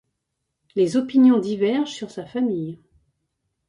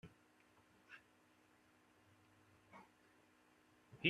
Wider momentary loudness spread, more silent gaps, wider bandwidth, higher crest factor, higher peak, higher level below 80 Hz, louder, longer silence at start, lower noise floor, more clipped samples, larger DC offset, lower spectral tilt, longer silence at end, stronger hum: first, 14 LU vs 5 LU; neither; second, 10.5 kHz vs 13 kHz; second, 16 dB vs 32 dB; first, -6 dBFS vs -20 dBFS; first, -66 dBFS vs -84 dBFS; first, -21 LUFS vs -64 LUFS; first, 0.75 s vs 0.05 s; first, -78 dBFS vs -73 dBFS; neither; neither; about the same, -6.5 dB/octave vs -5.5 dB/octave; first, 0.95 s vs 0 s; neither